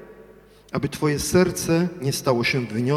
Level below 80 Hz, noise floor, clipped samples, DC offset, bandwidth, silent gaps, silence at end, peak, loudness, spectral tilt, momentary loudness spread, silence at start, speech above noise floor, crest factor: -48 dBFS; -49 dBFS; under 0.1%; under 0.1%; 15.5 kHz; none; 0 s; -6 dBFS; -22 LUFS; -5 dB/octave; 8 LU; 0 s; 28 dB; 18 dB